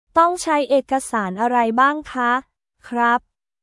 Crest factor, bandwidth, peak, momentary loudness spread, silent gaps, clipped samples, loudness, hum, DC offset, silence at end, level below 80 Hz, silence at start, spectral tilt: 18 dB; 12 kHz; -2 dBFS; 6 LU; none; under 0.1%; -19 LUFS; none; under 0.1%; 0.45 s; -58 dBFS; 0.15 s; -4 dB/octave